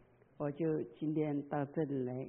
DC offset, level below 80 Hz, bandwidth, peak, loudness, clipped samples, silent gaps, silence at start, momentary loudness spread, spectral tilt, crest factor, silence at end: under 0.1%; -76 dBFS; 3.5 kHz; -22 dBFS; -38 LUFS; under 0.1%; none; 0.4 s; 4 LU; -7 dB/octave; 16 dB; 0 s